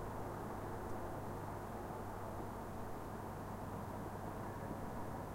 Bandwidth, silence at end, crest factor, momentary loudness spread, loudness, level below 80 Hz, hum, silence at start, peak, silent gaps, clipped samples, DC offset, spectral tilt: 16 kHz; 0 s; 14 dB; 2 LU; -47 LUFS; -56 dBFS; none; 0 s; -32 dBFS; none; under 0.1%; under 0.1%; -7 dB/octave